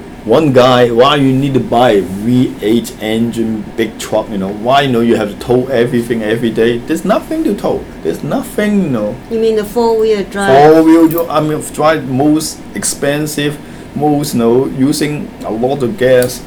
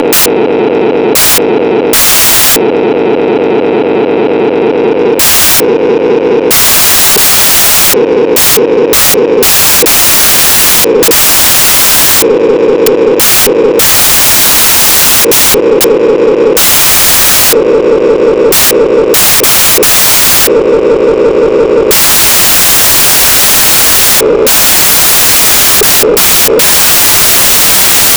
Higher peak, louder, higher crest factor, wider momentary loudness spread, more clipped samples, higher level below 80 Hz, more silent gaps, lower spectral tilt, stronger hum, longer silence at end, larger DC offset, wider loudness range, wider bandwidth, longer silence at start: about the same, 0 dBFS vs 0 dBFS; second, -12 LUFS vs -3 LUFS; first, 12 dB vs 6 dB; first, 10 LU vs 6 LU; about the same, 0.3% vs 0.4%; second, -38 dBFS vs -32 dBFS; neither; first, -5.5 dB/octave vs -1.5 dB/octave; neither; about the same, 0 s vs 0 s; neither; about the same, 4 LU vs 3 LU; about the same, over 20 kHz vs over 20 kHz; about the same, 0 s vs 0 s